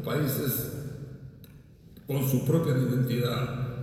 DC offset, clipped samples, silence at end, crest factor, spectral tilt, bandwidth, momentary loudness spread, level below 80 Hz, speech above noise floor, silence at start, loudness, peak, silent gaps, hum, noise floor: under 0.1%; under 0.1%; 0 s; 16 dB; -6.5 dB/octave; 17 kHz; 18 LU; -54 dBFS; 24 dB; 0 s; -28 LUFS; -12 dBFS; none; none; -51 dBFS